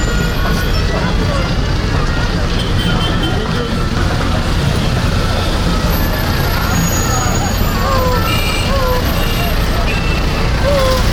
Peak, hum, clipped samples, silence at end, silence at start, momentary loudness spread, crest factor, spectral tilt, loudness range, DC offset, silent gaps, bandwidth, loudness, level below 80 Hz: -2 dBFS; none; under 0.1%; 0 s; 0 s; 2 LU; 12 dB; -5 dB/octave; 1 LU; under 0.1%; none; over 20 kHz; -15 LUFS; -18 dBFS